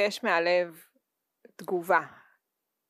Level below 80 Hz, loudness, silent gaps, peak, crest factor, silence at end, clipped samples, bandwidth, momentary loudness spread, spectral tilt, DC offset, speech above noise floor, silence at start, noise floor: under -90 dBFS; -27 LUFS; none; -10 dBFS; 20 dB; 0.8 s; under 0.1%; 15.5 kHz; 16 LU; -4 dB/octave; under 0.1%; 56 dB; 0 s; -84 dBFS